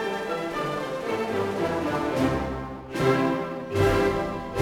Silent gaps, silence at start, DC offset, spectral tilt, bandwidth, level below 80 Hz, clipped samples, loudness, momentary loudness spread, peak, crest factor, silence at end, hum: none; 0 s; under 0.1%; -6 dB/octave; 18.5 kHz; -44 dBFS; under 0.1%; -26 LUFS; 7 LU; -10 dBFS; 16 dB; 0 s; none